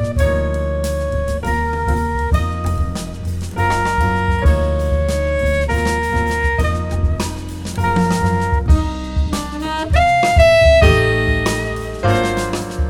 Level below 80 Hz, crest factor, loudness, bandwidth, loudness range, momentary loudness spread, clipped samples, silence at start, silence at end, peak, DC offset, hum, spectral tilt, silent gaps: -22 dBFS; 16 dB; -17 LUFS; 14.5 kHz; 5 LU; 10 LU; under 0.1%; 0 s; 0 s; 0 dBFS; under 0.1%; none; -6 dB/octave; none